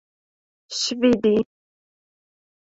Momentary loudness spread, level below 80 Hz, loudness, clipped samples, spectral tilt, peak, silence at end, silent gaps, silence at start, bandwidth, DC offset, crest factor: 13 LU; -60 dBFS; -21 LUFS; under 0.1%; -4 dB/octave; -6 dBFS; 1.25 s; none; 0.7 s; 8 kHz; under 0.1%; 18 dB